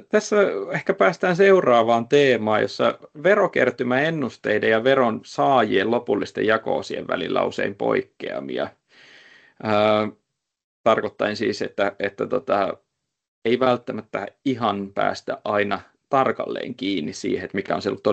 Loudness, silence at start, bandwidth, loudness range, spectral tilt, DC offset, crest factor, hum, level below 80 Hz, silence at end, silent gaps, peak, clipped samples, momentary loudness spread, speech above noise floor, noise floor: -22 LUFS; 0.15 s; 8.6 kHz; 6 LU; -5.5 dB/octave; under 0.1%; 18 dB; none; -66 dBFS; 0 s; 10.64-10.84 s, 13.28-13.42 s; -2 dBFS; under 0.1%; 10 LU; 29 dB; -51 dBFS